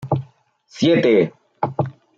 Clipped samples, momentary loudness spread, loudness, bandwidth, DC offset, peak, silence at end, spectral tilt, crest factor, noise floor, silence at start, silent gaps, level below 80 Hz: under 0.1%; 11 LU; -19 LUFS; 7.8 kHz; under 0.1%; -4 dBFS; 0.25 s; -7 dB/octave; 16 dB; -54 dBFS; 0 s; none; -60 dBFS